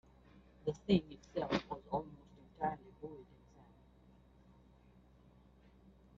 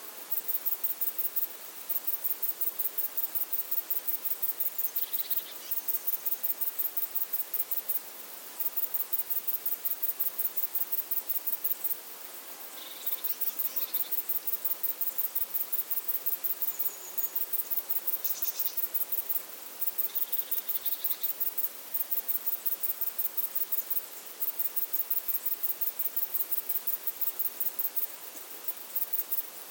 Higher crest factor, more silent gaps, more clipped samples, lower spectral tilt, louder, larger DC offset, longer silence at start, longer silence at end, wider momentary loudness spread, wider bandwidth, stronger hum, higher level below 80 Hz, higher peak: first, 26 dB vs 20 dB; neither; neither; first, -5.5 dB/octave vs 1 dB/octave; second, -40 LUFS vs -29 LUFS; neither; first, 0.35 s vs 0 s; first, 2.95 s vs 0 s; first, 23 LU vs 4 LU; second, 7.4 kHz vs 17.5 kHz; neither; first, -64 dBFS vs under -90 dBFS; second, -18 dBFS vs -12 dBFS